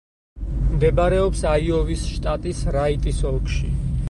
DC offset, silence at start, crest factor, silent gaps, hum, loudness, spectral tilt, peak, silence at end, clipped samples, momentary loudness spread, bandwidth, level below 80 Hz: under 0.1%; 0.35 s; 14 dB; none; none; -22 LUFS; -6.5 dB/octave; -6 dBFS; 0 s; under 0.1%; 7 LU; 11.5 kHz; -24 dBFS